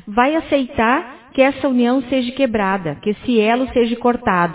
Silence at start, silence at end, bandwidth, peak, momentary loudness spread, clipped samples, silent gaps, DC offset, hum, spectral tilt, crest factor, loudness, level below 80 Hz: 0.05 s; 0 s; 4 kHz; 0 dBFS; 5 LU; under 0.1%; none; under 0.1%; none; -10 dB/octave; 16 dB; -17 LUFS; -46 dBFS